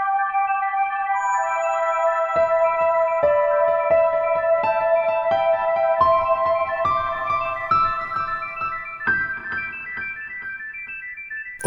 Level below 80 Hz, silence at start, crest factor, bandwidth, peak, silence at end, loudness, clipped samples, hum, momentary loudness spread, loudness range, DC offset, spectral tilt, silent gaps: -52 dBFS; 0 s; 16 dB; 11.5 kHz; -6 dBFS; 0 s; -21 LUFS; under 0.1%; none; 11 LU; 5 LU; under 0.1%; -4 dB/octave; none